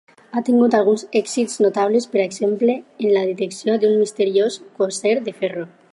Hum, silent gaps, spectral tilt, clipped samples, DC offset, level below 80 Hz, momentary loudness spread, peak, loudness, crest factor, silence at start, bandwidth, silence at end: none; none; -4.5 dB/octave; under 0.1%; under 0.1%; -74 dBFS; 8 LU; -2 dBFS; -19 LUFS; 16 dB; 0.35 s; 11.5 kHz; 0.25 s